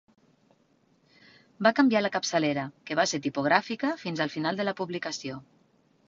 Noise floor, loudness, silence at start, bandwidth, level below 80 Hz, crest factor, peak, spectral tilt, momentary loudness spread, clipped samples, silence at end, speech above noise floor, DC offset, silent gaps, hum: -66 dBFS; -27 LUFS; 1.6 s; 7.6 kHz; -72 dBFS; 24 dB; -6 dBFS; -4 dB/octave; 10 LU; under 0.1%; 0.65 s; 39 dB; under 0.1%; none; none